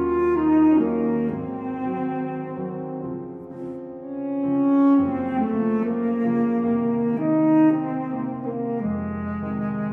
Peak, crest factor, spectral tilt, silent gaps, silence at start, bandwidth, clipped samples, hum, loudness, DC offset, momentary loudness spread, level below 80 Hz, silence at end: -8 dBFS; 14 dB; -10.5 dB/octave; none; 0 s; 3.5 kHz; under 0.1%; none; -23 LUFS; under 0.1%; 14 LU; -54 dBFS; 0 s